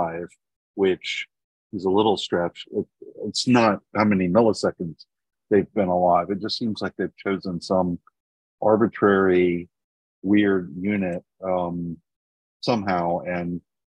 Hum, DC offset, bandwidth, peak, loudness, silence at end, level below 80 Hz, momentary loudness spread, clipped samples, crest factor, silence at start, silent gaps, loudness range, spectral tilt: none; under 0.1%; 10.5 kHz; -4 dBFS; -23 LUFS; 0.35 s; -60 dBFS; 15 LU; under 0.1%; 18 dB; 0 s; 0.56-0.74 s, 1.44-1.70 s, 8.20-8.58 s, 9.84-10.22 s, 12.16-12.60 s; 4 LU; -6 dB/octave